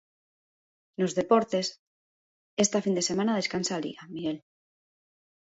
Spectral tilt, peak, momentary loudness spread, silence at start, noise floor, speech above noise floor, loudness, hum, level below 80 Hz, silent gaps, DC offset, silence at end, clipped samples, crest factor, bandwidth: -4 dB/octave; -10 dBFS; 12 LU; 1 s; under -90 dBFS; over 63 dB; -28 LUFS; none; -70 dBFS; 1.79-2.57 s; under 0.1%; 1.2 s; under 0.1%; 20 dB; 8 kHz